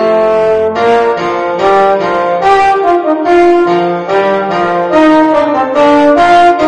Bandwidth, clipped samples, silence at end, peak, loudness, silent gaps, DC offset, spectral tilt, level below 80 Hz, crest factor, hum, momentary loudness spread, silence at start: 9.8 kHz; 0.7%; 0 s; 0 dBFS; -9 LUFS; none; under 0.1%; -6 dB/octave; -42 dBFS; 8 dB; none; 5 LU; 0 s